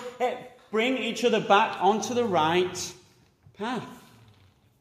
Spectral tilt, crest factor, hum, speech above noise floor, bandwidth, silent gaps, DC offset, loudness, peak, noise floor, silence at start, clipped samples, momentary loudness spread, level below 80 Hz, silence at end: -4 dB/octave; 20 dB; none; 34 dB; 15.5 kHz; none; under 0.1%; -26 LUFS; -8 dBFS; -59 dBFS; 0 s; under 0.1%; 15 LU; -70 dBFS; 0.8 s